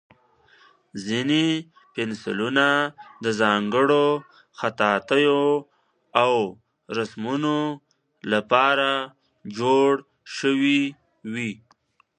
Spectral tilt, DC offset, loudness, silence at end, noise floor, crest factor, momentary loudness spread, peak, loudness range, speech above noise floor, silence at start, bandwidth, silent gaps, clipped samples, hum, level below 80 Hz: -5 dB/octave; under 0.1%; -23 LUFS; 0.65 s; -63 dBFS; 22 dB; 16 LU; -2 dBFS; 3 LU; 41 dB; 0.95 s; 9.8 kHz; none; under 0.1%; none; -70 dBFS